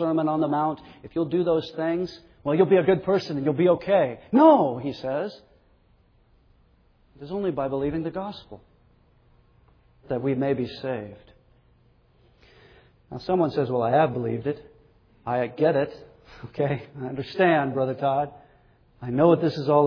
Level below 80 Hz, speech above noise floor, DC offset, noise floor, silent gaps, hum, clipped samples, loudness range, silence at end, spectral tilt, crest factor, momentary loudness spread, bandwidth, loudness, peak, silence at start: -58 dBFS; 37 dB; under 0.1%; -60 dBFS; none; none; under 0.1%; 11 LU; 0 s; -8.5 dB/octave; 20 dB; 15 LU; 5.4 kHz; -24 LUFS; -6 dBFS; 0 s